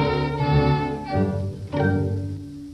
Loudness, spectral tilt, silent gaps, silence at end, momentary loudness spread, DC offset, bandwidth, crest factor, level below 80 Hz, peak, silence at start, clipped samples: -23 LUFS; -8.5 dB/octave; none; 0 s; 9 LU; under 0.1%; 8.6 kHz; 16 dB; -38 dBFS; -8 dBFS; 0 s; under 0.1%